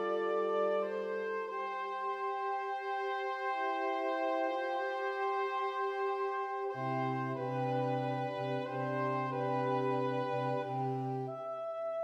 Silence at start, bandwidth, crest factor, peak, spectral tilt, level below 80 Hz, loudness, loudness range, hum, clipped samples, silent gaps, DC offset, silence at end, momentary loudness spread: 0 s; 8.8 kHz; 14 dB; -22 dBFS; -7.5 dB/octave; -86 dBFS; -35 LUFS; 1 LU; none; under 0.1%; none; under 0.1%; 0 s; 4 LU